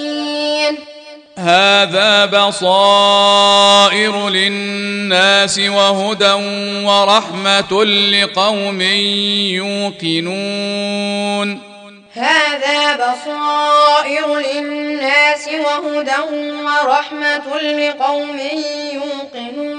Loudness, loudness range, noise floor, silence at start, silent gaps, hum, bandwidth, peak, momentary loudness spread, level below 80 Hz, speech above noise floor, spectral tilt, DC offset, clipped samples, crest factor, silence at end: -13 LUFS; 7 LU; -38 dBFS; 0 s; none; none; 10 kHz; 0 dBFS; 11 LU; -64 dBFS; 24 dB; -2.5 dB/octave; under 0.1%; under 0.1%; 14 dB; 0 s